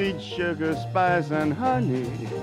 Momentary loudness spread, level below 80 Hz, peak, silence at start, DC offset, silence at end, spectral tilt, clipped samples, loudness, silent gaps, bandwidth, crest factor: 6 LU; -52 dBFS; -10 dBFS; 0 s; under 0.1%; 0 s; -7 dB/octave; under 0.1%; -25 LUFS; none; 13.5 kHz; 14 dB